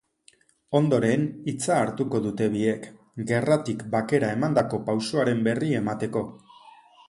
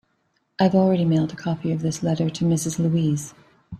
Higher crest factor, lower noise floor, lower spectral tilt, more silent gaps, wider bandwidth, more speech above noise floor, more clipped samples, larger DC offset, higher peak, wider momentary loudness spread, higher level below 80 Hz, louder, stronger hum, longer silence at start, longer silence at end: about the same, 18 dB vs 16 dB; second, -60 dBFS vs -69 dBFS; about the same, -6.5 dB/octave vs -6.5 dB/octave; neither; second, 11.5 kHz vs 13 kHz; second, 36 dB vs 48 dB; neither; neither; about the same, -6 dBFS vs -6 dBFS; about the same, 7 LU vs 8 LU; about the same, -62 dBFS vs -58 dBFS; second, -25 LUFS vs -22 LUFS; neither; about the same, 0.7 s vs 0.6 s; first, 0.4 s vs 0 s